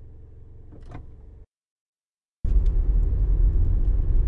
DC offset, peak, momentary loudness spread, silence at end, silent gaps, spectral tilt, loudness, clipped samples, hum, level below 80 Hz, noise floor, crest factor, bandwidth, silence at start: under 0.1%; -10 dBFS; 22 LU; 0 s; 1.58-1.93 s, 2.00-2.18 s, 2.31-2.43 s; -10.5 dB/octave; -25 LUFS; under 0.1%; none; -24 dBFS; under -90 dBFS; 14 dB; 1.8 kHz; 0 s